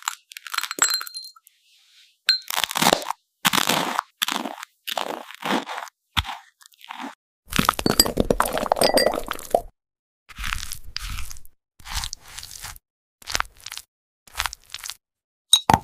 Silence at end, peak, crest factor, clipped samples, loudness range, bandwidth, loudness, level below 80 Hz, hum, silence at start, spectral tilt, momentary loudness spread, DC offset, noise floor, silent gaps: 0 s; 0 dBFS; 26 dB; under 0.1%; 11 LU; 16 kHz; -23 LUFS; -42 dBFS; none; 0.05 s; -2 dB/octave; 18 LU; under 0.1%; -58 dBFS; 7.15-7.43 s, 9.99-10.26 s, 12.90-13.18 s, 13.88-14.26 s, 15.24-15.45 s